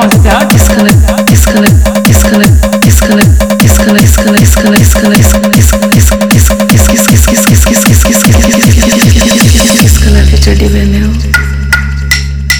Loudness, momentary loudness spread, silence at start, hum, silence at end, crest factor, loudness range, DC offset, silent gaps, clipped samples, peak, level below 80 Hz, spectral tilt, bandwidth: -5 LUFS; 4 LU; 0 s; none; 0 s; 4 dB; 1 LU; under 0.1%; none; 8%; 0 dBFS; -10 dBFS; -4.5 dB/octave; over 20 kHz